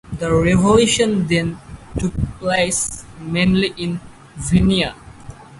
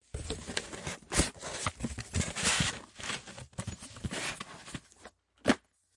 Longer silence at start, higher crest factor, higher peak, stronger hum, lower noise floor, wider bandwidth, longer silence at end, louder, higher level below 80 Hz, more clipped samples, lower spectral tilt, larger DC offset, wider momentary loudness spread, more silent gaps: about the same, 0.05 s vs 0.15 s; second, 18 dB vs 26 dB; first, 0 dBFS vs -10 dBFS; neither; second, -38 dBFS vs -57 dBFS; about the same, 11.5 kHz vs 11.5 kHz; second, 0 s vs 0.4 s; first, -18 LUFS vs -34 LUFS; first, -34 dBFS vs -48 dBFS; neither; first, -5 dB/octave vs -3 dB/octave; neither; about the same, 16 LU vs 14 LU; neither